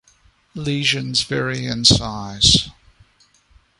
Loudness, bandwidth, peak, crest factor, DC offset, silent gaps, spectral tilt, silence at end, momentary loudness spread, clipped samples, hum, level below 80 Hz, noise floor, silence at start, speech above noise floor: -17 LUFS; 11.5 kHz; 0 dBFS; 22 dB; under 0.1%; none; -3 dB/octave; 1.1 s; 15 LU; under 0.1%; none; -38 dBFS; -57 dBFS; 0.55 s; 38 dB